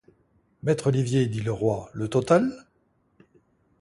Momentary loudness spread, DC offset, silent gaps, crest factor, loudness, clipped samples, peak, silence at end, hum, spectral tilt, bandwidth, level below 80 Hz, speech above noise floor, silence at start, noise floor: 9 LU; under 0.1%; none; 20 dB; -25 LUFS; under 0.1%; -6 dBFS; 1.2 s; none; -7 dB/octave; 11.5 kHz; -56 dBFS; 44 dB; 0.65 s; -68 dBFS